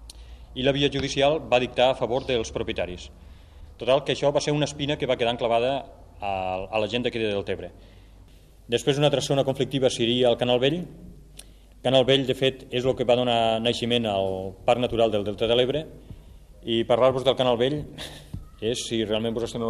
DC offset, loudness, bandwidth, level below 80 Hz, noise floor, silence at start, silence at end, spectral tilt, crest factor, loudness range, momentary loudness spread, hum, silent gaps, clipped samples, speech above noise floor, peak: under 0.1%; -24 LUFS; 13.5 kHz; -48 dBFS; -50 dBFS; 0 s; 0 s; -5 dB/octave; 20 dB; 3 LU; 11 LU; none; none; under 0.1%; 26 dB; -6 dBFS